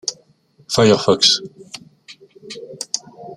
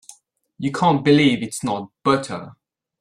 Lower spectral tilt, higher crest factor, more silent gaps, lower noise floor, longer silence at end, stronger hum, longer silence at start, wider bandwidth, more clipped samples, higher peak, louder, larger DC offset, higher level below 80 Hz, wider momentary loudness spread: second, -3.5 dB/octave vs -5.5 dB/octave; about the same, 20 dB vs 16 dB; neither; about the same, -54 dBFS vs -52 dBFS; second, 0 s vs 0.5 s; neither; second, 0.05 s vs 0.6 s; about the same, 14 kHz vs 13 kHz; neither; first, 0 dBFS vs -4 dBFS; first, -16 LUFS vs -19 LUFS; neither; about the same, -58 dBFS vs -58 dBFS; first, 23 LU vs 13 LU